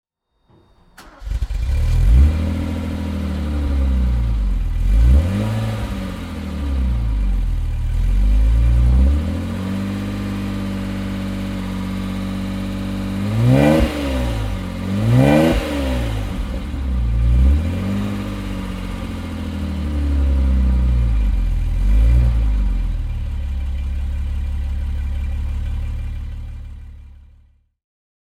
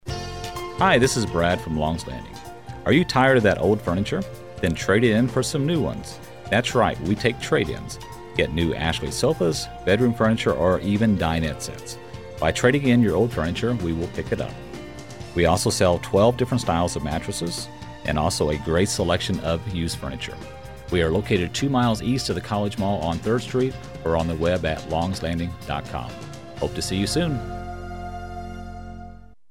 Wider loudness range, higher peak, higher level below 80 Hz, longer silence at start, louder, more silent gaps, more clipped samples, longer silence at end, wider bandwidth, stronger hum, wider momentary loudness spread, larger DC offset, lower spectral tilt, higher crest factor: about the same, 7 LU vs 5 LU; first, 0 dBFS vs -6 dBFS; first, -20 dBFS vs -40 dBFS; first, 1 s vs 0.05 s; first, -20 LUFS vs -23 LUFS; neither; neither; first, 1.2 s vs 0.25 s; second, 13 kHz vs 16.5 kHz; neither; second, 11 LU vs 16 LU; second, under 0.1% vs 0.4%; first, -7.5 dB/octave vs -5.5 dB/octave; about the same, 18 dB vs 18 dB